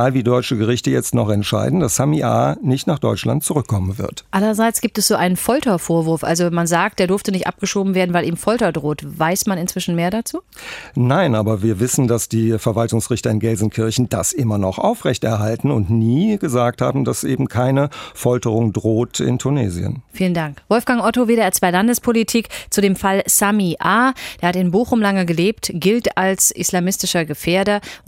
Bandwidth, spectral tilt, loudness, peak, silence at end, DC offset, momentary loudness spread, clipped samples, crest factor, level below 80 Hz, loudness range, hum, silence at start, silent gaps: 16 kHz; -5 dB/octave; -17 LUFS; 0 dBFS; 0.1 s; under 0.1%; 5 LU; under 0.1%; 16 dB; -48 dBFS; 3 LU; none; 0 s; none